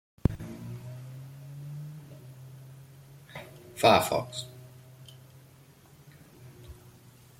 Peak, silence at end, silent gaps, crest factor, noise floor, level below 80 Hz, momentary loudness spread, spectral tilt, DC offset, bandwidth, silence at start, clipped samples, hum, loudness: -8 dBFS; 0.3 s; none; 26 dB; -56 dBFS; -50 dBFS; 28 LU; -5 dB/octave; under 0.1%; 16.5 kHz; 0.25 s; under 0.1%; none; -29 LUFS